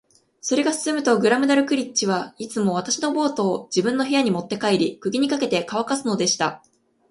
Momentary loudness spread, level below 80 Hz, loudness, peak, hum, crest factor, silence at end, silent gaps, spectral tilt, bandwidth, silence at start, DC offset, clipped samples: 6 LU; -66 dBFS; -22 LUFS; -4 dBFS; none; 18 dB; 0.55 s; none; -4 dB/octave; 11.5 kHz; 0.45 s; under 0.1%; under 0.1%